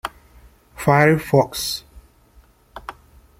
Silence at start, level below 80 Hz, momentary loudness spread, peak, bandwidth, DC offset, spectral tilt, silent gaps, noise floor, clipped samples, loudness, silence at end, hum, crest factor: 0.05 s; -48 dBFS; 22 LU; -2 dBFS; 16.5 kHz; under 0.1%; -5.5 dB/octave; none; -53 dBFS; under 0.1%; -18 LUFS; 0.5 s; none; 20 dB